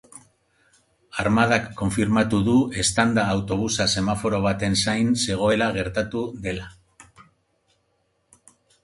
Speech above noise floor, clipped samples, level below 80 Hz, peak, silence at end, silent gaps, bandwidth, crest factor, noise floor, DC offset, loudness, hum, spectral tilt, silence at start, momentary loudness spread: 48 dB; under 0.1%; -46 dBFS; -4 dBFS; 1.6 s; none; 11.5 kHz; 20 dB; -69 dBFS; under 0.1%; -22 LUFS; none; -4.5 dB/octave; 0.15 s; 9 LU